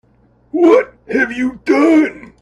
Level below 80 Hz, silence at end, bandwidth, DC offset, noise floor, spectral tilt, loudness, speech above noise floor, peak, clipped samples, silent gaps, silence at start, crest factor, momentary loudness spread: -52 dBFS; 0.2 s; 10.5 kHz; under 0.1%; -53 dBFS; -5.5 dB/octave; -14 LUFS; 40 dB; 0 dBFS; under 0.1%; none; 0.55 s; 14 dB; 9 LU